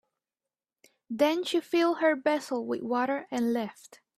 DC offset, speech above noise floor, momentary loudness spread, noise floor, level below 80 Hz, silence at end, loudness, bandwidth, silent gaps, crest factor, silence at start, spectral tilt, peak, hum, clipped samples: under 0.1%; over 62 dB; 7 LU; under -90 dBFS; -78 dBFS; 0.25 s; -28 LUFS; 14.5 kHz; none; 18 dB; 1.1 s; -4 dB/octave; -12 dBFS; none; under 0.1%